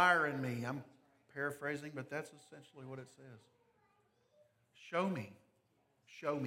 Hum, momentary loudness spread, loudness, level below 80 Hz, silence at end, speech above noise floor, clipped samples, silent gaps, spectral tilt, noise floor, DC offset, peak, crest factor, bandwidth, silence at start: none; 21 LU; -40 LUFS; -88 dBFS; 0 s; 38 dB; under 0.1%; none; -5.5 dB/octave; -77 dBFS; under 0.1%; -16 dBFS; 26 dB; 16.5 kHz; 0 s